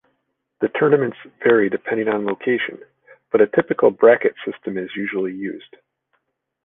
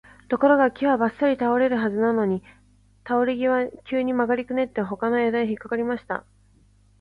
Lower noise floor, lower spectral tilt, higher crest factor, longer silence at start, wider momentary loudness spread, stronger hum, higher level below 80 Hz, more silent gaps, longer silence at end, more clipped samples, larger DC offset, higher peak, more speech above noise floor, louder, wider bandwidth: first, -72 dBFS vs -57 dBFS; first, -9.5 dB/octave vs -8 dB/octave; about the same, 18 dB vs 18 dB; first, 0.6 s vs 0.3 s; first, 14 LU vs 8 LU; second, none vs 50 Hz at -55 dBFS; second, -64 dBFS vs -58 dBFS; neither; first, 1.05 s vs 0.8 s; neither; neither; first, -2 dBFS vs -6 dBFS; first, 54 dB vs 35 dB; first, -19 LUFS vs -23 LUFS; second, 3.8 kHz vs 5 kHz